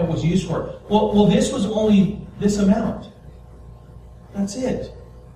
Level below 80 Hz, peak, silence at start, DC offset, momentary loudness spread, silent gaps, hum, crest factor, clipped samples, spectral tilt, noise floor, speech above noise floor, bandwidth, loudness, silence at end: -40 dBFS; -4 dBFS; 0 s; under 0.1%; 14 LU; none; none; 18 dB; under 0.1%; -6.5 dB/octave; -42 dBFS; 23 dB; 11 kHz; -20 LUFS; 0.15 s